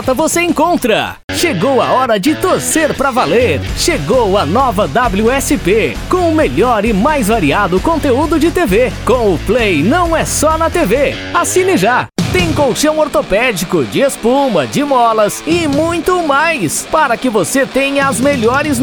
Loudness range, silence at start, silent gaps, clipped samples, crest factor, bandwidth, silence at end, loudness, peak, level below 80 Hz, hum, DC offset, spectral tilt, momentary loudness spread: 1 LU; 0 s; 1.24-1.28 s; under 0.1%; 10 dB; over 20 kHz; 0 s; -12 LUFS; -2 dBFS; -30 dBFS; none; under 0.1%; -4.5 dB/octave; 3 LU